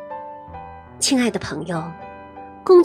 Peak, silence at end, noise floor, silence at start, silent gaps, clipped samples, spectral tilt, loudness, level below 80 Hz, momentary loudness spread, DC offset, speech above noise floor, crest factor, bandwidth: -2 dBFS; 0 s; -39 dBFS; 0 s; none; under 0.1%; -4 dB/octave; -21 LUFS; -52 dBFS; 20 LU; under 0.1%; 17 dB; 18 dB; 14.5 kHz